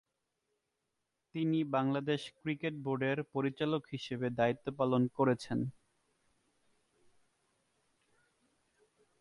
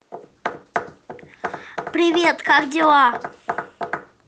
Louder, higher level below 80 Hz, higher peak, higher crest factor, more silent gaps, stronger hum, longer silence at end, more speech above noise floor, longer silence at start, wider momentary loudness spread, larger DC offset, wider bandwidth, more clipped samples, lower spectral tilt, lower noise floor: second, -35 LUFS vs -19 LUFS; second, -74 dBFS vs -64 dBFS; second, -18 dBFS vs -2 dBFS; about the same, 20 dB vs 18 dB; neither; neither; first, 3.5 s vs 0.25 s; first, 51 dB vs 25 dB; first, 1.35 s vs 0.1 s; second, 6 LU vs 16 LU; neither; first, 11.5 kHz vs 9.4 kHz; neither; first, -7 dB/octave vs -3.5 dB/octave; first, -85 dBFS vs -41 dBFS